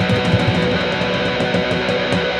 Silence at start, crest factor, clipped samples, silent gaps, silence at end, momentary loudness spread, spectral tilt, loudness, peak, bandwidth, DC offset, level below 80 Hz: 0 s; 16 dB; under 0.1%; none; 0 s; 2 LU; -6 dB/octave; -17 LUFS; -2 dBFS; 11 kHz; under 0.1%; -38 dBFS